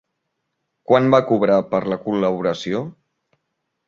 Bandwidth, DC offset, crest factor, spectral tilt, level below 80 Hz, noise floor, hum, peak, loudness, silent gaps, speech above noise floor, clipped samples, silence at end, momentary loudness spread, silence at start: 7.4 kHz; under 0.1%; 18 dB; -7 dB/octave; -60 dBFS; -76 dBFS; none; -2 dBFS; -19 LUFS; none; 58 dB; under 0.1%; 0.95 s; 11 LU; 0.9 s